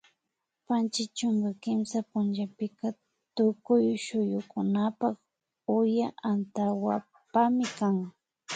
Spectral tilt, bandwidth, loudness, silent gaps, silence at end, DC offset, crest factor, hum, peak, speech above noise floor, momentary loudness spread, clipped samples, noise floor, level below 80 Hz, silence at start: -6 dB/octave; 9.2 kHz; -29 LUFS; none; 0 s; under 0.1%; 16 dB; none; -12 dBFS; 56 dB; 9 LU; under 0.1%; -84 dBFS; -76 dBFS; 0.7 s